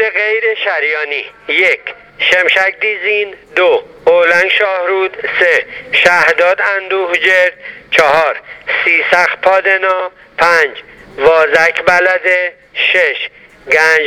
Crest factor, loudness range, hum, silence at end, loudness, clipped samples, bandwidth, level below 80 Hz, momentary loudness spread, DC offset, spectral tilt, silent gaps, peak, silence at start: 12 dB; 2 LU; none; 0 s; -11 LUFS; 0.2%; 16.5 kHz; -52 dBFS; 8 LU; under 0.1%; -2.5 dB/octave; none; 0 dBFS; 0 s